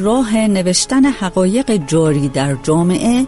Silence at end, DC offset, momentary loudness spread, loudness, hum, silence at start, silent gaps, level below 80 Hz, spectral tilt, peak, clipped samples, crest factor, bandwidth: 0 s; under 0.1%; 3 LU; -14 LUFS; none; 0 s; none; -38 dBFS; -5 dB/octave; 0 dBFS; under 0.1%; 12 dB; 11.5 kHz